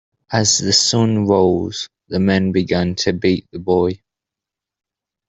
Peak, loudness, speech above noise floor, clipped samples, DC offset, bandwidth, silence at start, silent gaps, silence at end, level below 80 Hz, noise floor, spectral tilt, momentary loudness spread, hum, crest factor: -2 dBFS; -16 LUFS; 69 dB; under 0.1%; under 0.1%; 8.4 kHz; 0.3 s; none; 1.35 s; -52 dBFS; -86 dBFS; -4 dB/octave; 10 LU; none; 16 dB